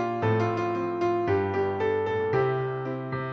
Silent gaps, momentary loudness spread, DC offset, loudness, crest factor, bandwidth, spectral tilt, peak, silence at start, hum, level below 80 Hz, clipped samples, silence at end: none; 6 LU; under 0.1%; -27 LUFS; 14 dB; 7.2 kHz; -8 dB/octave; -12 dBFS; 0 s; none; -60 dBFS; under 0.1%; 0 s